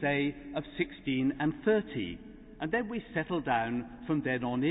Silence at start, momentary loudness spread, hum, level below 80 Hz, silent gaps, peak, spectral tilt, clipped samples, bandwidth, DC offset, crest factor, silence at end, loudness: 0 s; 10 LU; none; -56 dBFS; none; -16 dBFS; -10 dB/octave; under 0.1%; 4 kHz; under 0.1%; 16 dB; 0 s; -32 LUFS